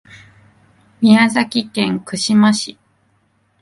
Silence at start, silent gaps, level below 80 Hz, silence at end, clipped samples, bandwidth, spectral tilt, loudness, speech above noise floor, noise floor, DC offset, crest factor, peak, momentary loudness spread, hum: 1 s; none; -60 dBFS; 0.9 s; under 0.1%; 11.5 kHz; -4.5 dB/octave; -15 LUFS; 46 dB; -60 dBFS; under 0.1%; 16 dB; 0 dBFS; 9 LU; none